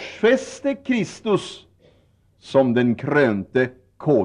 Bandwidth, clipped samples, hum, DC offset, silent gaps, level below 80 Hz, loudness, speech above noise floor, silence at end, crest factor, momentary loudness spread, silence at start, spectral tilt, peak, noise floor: 10.5 kHz; under 0.1%; none; under 0.1%; none; -62 dBFS; -21 LUFS; 38 dB; 0 s; 16 dB; 8 LU; 0 s; -6.5 dB/octave; -6 dBFS; -59 dBFS